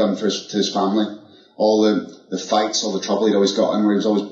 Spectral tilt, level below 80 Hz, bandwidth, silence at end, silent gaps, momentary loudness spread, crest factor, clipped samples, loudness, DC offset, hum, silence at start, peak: -4.5 dB/octave; -72 dBFS; 8 kHz; 0 s; none; 6 LU; 14 dB; under 0.1%; -19 LUFS; under 0.1%; none; 0 s; -4 dBFS